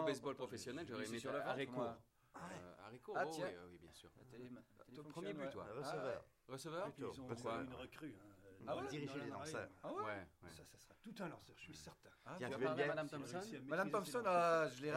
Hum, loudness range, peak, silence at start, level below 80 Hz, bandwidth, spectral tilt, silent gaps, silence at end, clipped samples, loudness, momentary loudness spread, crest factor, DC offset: none; 6 LU; -26 dBFS; 0 s; -80 dBFS; 16 kHz; -5 dB/octave; none; 0 s; under 0.1%; -45 LUFS; 20 LU; 20 dB; under 0.1%